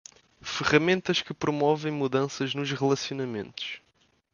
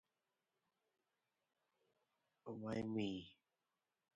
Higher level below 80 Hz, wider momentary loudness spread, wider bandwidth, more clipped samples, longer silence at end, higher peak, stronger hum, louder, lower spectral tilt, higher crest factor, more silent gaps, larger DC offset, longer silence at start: first, -62 dBFS vs -78 dBFS; second, 12 LU vs 17 LU; about the same, 7.4 kHz vs 7.4 kHz; neither; second, 0.55 s vs 0.85 s; first, -8 dBFS vs -32 dBFS; neither; first, -27 LUFS vs -46 LUFS; about the same, -5 dB/octave vs -5.5 dB/octave; about the same, 20 dB vs 20 dB; neither; neither; second, 0.45 s vs 2.45 s